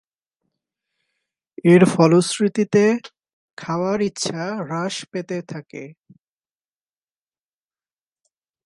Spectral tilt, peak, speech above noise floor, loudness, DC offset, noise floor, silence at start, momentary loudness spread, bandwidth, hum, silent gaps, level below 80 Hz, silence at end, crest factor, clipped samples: -6 dB/octave; 0 dBFS; over 71 dB; -19 LUFS; under 0.1%; under -90 dBFS; 1.65 s; 19 LU; 11.5 kHz; none; 3.33-3.57 s; -66 dBFS; 2.75 s; 22 dB; under 0.1%